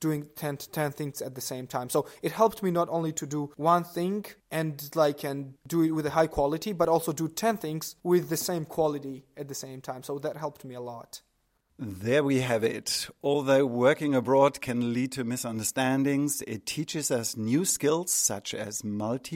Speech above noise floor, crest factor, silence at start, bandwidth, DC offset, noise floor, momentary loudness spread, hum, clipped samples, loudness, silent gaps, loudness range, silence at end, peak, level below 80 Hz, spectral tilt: 44 dB; 20 dB; 0 s; 16.5 kHz; under 0.1%; -72 dBFS; 13 LU; none; under 0.1%; -28 LUFS; none; 6 LU; 0 s; -8 dBFS; -60 dBFS; -4.5 dB/octave